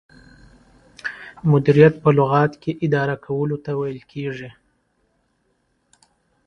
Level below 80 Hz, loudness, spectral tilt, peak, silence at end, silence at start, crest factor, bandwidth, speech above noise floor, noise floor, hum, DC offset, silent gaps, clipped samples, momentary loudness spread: -54 dBFS; -19 LUFS; -9 dB/octave; 0 dBFS; 1.95 s; 1.05 s; 22 dB; 6.6 kHz; 49 dB; -67 dBFS; none; under 0.1%; none; under 0.1%; 18 LU